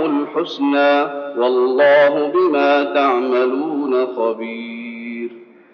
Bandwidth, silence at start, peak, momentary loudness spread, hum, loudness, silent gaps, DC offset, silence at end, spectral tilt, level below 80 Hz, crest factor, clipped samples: 6.4 kHz; 0 s; -4 dBFS; 15 LU; none; -16 LUFS; none; under 0.1%; 0.3 s; -2 dB/octave; -86 dBFS; 12 dB; under 0.1%